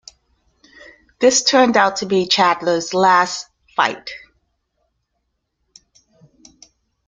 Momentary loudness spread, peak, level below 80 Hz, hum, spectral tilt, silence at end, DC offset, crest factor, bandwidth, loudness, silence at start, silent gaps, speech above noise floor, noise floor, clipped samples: 15 LU; 0 dBFS; -62 dBFS; none; -2.5 dB/octave; 2.9 s; under 0.1%; 18 dB; 9.6 kHz; -16 LUFS; 1.2 s; none; 57 dB; -72 dBFS; under 0.1%